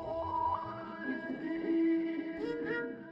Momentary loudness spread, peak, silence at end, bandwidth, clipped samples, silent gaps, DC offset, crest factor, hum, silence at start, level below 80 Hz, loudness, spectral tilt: 8 LU; -24 dBFS; 0 s; 5.6 kHz; under 0.1%; none; under 0.1%; 12 dB; none; 0 s; -64 dBFS; -35 LUFS; -8 dB/octave